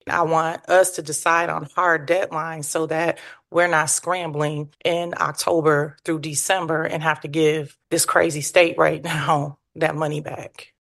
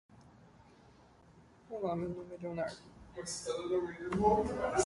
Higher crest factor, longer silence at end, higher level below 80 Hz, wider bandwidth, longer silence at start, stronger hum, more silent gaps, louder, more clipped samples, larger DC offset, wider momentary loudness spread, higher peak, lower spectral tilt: about the same, 20 dB vs 22 dB; first, 0.15 s vs 0 s; second, -64 dBFS vs -58 dBFS; about the same, 12.5 kHz vs 11.5 kHz; about the same, 0.05 s vs 0.1 s; neither; neither; first, -21 LUFS vs -36 LUFS; neither; neither; second, 8 LU vs 16 LU; first, -2 dBFS vs -16 dBFS; second, -3.5 dB/octave vs -5 dB/octave